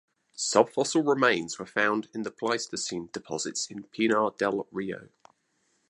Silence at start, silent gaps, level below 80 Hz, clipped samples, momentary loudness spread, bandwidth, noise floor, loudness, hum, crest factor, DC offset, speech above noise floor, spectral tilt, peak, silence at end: 0.4 s; none; -72 dBFS; under 0.1%; 12 LU; 11.5 kHz; -73 dBFS; -28 LUFS; none; 22 dB; under 0.1%; 45 dB; -3 dB/octave; -6 dBFS; 0.85 s